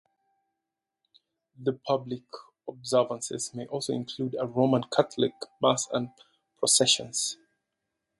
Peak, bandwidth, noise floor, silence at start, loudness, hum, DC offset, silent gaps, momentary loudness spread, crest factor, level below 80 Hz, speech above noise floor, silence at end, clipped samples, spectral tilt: -6 dBFS; 12 kHz; -86 dBFS; 1.6 s; -27 LUFS; none; under 0.1%; none; 16 LU; 24 dB; -72 dBFS; 59 dB; 0.85 s; under 0.1%; -3.5 dB/octave